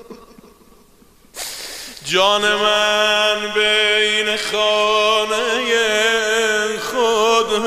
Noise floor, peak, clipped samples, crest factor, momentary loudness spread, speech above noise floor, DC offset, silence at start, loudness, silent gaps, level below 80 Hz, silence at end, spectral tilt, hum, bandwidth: -50 dBFS; -2 dBFS; under 0.1%; 16 dB; 12 LU; 33 dB; under 0.1%; 0.1 s; -15 LUFS; none; -52 dBFS; 0 s; -1 dB/octave; none; 15.5 kHz